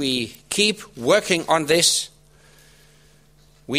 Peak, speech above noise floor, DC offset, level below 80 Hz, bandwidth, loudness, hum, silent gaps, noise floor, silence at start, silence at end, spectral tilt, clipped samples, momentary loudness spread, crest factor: -2 dBFS; 34 dB; under 0.1%; -58 dBFS; 16 kHz; -19 LUFS; none; none; -55 dBFS; 0 s; 0 s; -2.5 dB/octave; under 0.1%; 10 LU; 20 dB